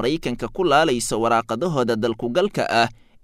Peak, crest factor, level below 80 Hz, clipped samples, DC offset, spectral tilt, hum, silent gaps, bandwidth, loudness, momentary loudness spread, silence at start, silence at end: -4 dBFS; 18 dB; -44 dBFS; under 0.1%; under 0.1%; -4.5 dB/octave; none; none; 16 kHz; -21 LUFS; 6 LU; 0 s; 0.3 s